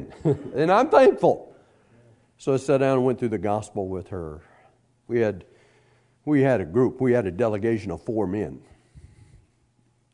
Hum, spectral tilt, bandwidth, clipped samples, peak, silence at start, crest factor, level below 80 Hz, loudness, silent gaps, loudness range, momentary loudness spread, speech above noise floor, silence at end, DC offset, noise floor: none; -7.5 dB/octave; 10.5 kHz; under 0.1%; -4 dBFS; 0 s; 22 dB; -58 dBFS; -23 LUFS; none; 6 LU; 15 LU; 43 dB; 1.15 s; under 0.1%; -65 dBFS